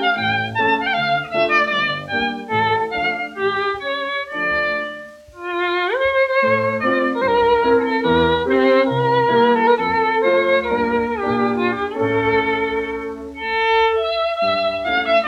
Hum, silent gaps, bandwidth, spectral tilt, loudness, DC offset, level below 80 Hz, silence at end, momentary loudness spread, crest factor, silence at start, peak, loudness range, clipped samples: none; none; 8.8 kHz; -6 dB/octave; -18 LUFS; under 0.1%; -48 dBFS; 0 s; 7 LU; 14 dB; 0 s; -4 dBFS; 5 LU; under 0.1%